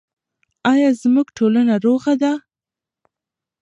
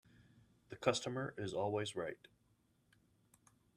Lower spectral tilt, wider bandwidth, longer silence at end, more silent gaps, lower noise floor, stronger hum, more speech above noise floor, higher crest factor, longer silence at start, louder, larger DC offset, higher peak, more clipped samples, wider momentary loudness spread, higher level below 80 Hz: first, -6 dB/octave vs -4.5 dB/octave; second, 10 kHz vs 13.5 kHz; second, 1.25 s vs 1.6 s; neither; first, -88 dBFS vs -76 dBFS; neither; first, 73 dB vs 36 dB; second, 14 dB vs 24 dB; first, 0.65 s vs 0.2 s; first, -17 LUFS vs -40 LUFS; neither; first, -4 dBFS vs -20 dBFS; neither; second, 6 LU vs 13 LU; first, -68 dBFS vs -76 dBFS